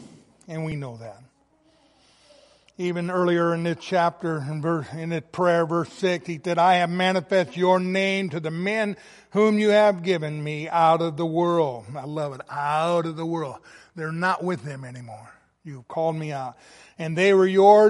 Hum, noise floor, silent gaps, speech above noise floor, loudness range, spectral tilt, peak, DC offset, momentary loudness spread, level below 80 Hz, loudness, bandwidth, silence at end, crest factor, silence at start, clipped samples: none; -61 dBFS; none; 39 dB; 8 LU; -6.5 dB/octave; -4 dBFS; under 0.1%; 17 LU; -68 dBFS; -23 LUFS; 11.5 kHz; 0 s; 20 dB; 0 s; under 0.1%